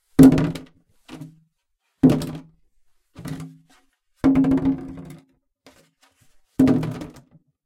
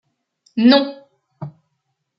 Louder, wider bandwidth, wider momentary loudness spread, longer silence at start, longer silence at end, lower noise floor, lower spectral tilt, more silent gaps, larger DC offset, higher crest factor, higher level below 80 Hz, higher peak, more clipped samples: second, -19 LUFS vs -15 LUFS; first, 16 kHz vs 5.8 kHz; first, 27 LU vs 23 LU; second, 0.2 s vs 0.55 s; about the same, 0.6 s vs 0.7 s; about the same, -73 dBFS vs -73 dBFS; about the same, -8 dB/octave vs -7.5 dB/octave; neither; neither; about the same, 22 dB vs 18 dB; first, -44 dBFS vs -68 dBFS; about the same, 0 dBFS vs -2 dBFS; neither